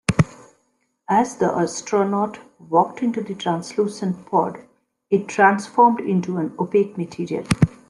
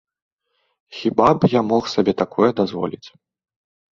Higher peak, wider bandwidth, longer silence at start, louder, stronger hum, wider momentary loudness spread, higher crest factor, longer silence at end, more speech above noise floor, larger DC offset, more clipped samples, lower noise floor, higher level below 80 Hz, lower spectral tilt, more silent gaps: about the same, 0 dBFS vs -2 dBFS; first, 12 kHz vs 7.6 kHz; second, 0.1 s vs 0.9 s; about the same, -21 LUFS vs -19 LUFS; neither; about the same, 10 LU vs 12 LU; about the same, 20 dB vs 20 dB; second, 0.2 s vs 0.85 s; second, 48 dB vs 52 dB; neither; neither; about the same, -68 dBFS vs -70 dBFS; about the same, -50 dBFS vs -54 dBFS; about the same, -6 dB/octave vs -7 dB/octave; neither